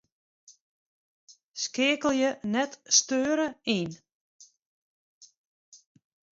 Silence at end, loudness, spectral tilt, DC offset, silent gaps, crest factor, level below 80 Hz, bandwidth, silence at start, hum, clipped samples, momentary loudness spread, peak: 1.15 s; -26 LUFS; -2 dB/octave; under 0.1%; 0.61-1.27 s, 1.45-1.52 s, 4.12-4.39 s, 4.62-5.21 s; 22 dB; -72 dBFS; 8 kHz; 0.5 s; none; under 0.1%; 11 LU; -8 dBFS